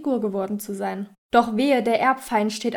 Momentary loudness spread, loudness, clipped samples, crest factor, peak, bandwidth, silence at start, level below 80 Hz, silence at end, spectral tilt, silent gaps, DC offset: 9 LU; -22 LUFS; under 0.1%; 18 dB; -4 dBFS; over 20 kHz; 0 s; -60 dBFS; 0 s; -5 dB/octave; 1.18-1.30 s; under 0.1%